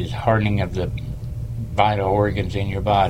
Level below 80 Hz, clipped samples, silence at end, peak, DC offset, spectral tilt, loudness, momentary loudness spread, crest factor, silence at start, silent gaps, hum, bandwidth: -34 dBFS; under 0.1%; 0 s; -2 dBFS; under 0.1%; -7.5 dB/octave; -22 LUFS; 11 LU; 18 dB; 0 s; none; none; 10.5 kHz